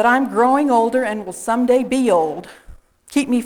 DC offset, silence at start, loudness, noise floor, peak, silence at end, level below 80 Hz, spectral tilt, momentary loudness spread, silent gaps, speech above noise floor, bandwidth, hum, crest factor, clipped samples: under 0.1%; 0 s; -17 LUFS; -42 dBFS; -4 dBFS; 0 s; -50 dBFS; -4.5 dB/octave; 9 LU; none; 25 dB; 16.5 kHz; none; 14 dB; under 0.1%